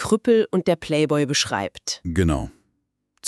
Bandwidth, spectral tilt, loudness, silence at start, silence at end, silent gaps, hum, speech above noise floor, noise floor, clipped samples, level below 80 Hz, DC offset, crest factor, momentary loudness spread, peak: 13 kHz; -4.5 dB/octave; -21 LUFS; 0 s; 0 s; none; none; 52 dB; -73 dBFS; under 0.1%; -40 dBFS; under 0.1%; 16 dB; 9 LU; -6 dBFS